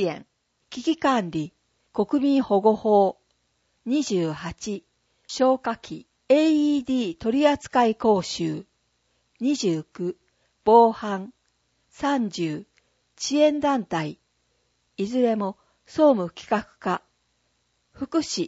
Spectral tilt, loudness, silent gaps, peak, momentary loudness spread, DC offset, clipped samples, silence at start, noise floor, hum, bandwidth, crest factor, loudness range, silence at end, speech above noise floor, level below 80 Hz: -5.5 dB/octave; -23 LUFS; none; -4 dBFS; 15 LU; under 0.1%; under 0.1%; 0 s; -71 dBFS; none; 8 kHz; 20 dB; 4 LU; 0 s; 48 dB; -62 dBFS